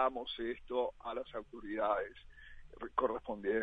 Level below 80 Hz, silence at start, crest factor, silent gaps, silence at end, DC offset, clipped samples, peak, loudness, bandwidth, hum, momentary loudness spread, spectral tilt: -60 dBFS; 0 s; 20 dB; none; 0 s; under 0.1%; under 0.1%; -18 dBFS; -39 LUFS; 5 kHz; none; 20 LU; -6.5 dB/octave